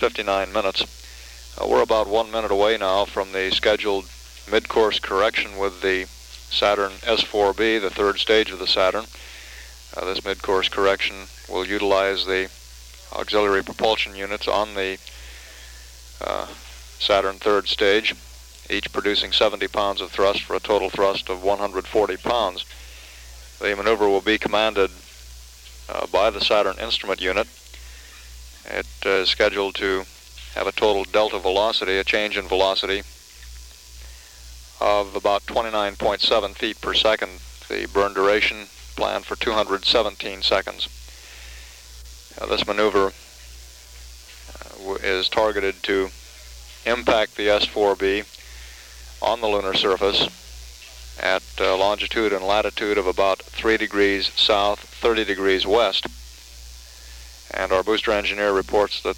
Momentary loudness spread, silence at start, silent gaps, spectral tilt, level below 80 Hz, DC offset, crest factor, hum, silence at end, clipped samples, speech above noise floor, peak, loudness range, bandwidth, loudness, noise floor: 22 LU; 0 s; none; -3 dB/octave; -44 dBFS; under 0.1%; 18 dB; none; 0 s; under 0.1%; 21 dB; -4 dBFS; 4 LU; 17 kHz; -21 LUFS; -42 dBFS